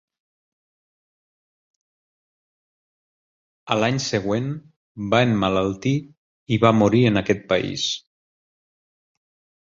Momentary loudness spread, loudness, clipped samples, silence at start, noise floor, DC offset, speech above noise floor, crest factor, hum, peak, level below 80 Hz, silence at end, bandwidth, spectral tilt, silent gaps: 10 LU; -21 LUFS; under 0.1%; 3.65 s; under -90 dBFS; under 0.1%; over 70 dB; 22 dB; none; -2 dBFS; -52 dBFS; 1.65 s; 7.6 kHz; -5.5 dB/octave; 4.76-4.95 s, 6.17-6.46 s